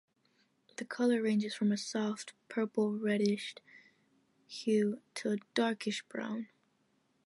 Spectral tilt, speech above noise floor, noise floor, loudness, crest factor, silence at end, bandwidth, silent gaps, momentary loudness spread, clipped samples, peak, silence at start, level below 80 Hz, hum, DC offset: -5 dB/octave; 41 dB; -75 dBFS; -34 LUFS; 18 dB; 0.8 s; 11.5 kHz; none; 13 LU; under 0.1%; -18 dBFS; 0.8 s; -84 dBFS; none; under 0.1%